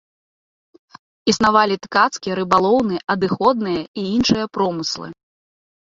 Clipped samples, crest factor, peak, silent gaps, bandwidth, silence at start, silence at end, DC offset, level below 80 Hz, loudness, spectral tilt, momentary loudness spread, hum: under 0.1%; 18 dB; -2 dBFS; 3.88-3.94 s; 7.8 kHz; 1.25 s; 0.8 s; under 0.1%; -52 dBFS; -18 LUFS; -4.5 dB/octave; 9 LU; none